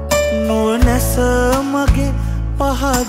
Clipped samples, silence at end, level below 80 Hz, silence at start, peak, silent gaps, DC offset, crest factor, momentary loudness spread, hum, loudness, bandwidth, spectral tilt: under 0.1%; 0 s; -20 dBFS; 0 s; 0 dBFS; none; under 0.1%; 14 dB; 5 LU; none; -16 LUFS; 16 kHz; -5.5 dB/octave